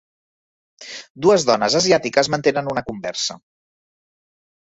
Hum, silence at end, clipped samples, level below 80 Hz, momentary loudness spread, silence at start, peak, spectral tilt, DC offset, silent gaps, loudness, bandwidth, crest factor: none; 1.4 s; under 0.1%; -58 dBFS; 14 LU; 0.8 s; -2 dBFS; -3.5 dB/octave; under 0.1%; 1.10-1.15 s; -18 LUFS; 8 kHz; 20 dB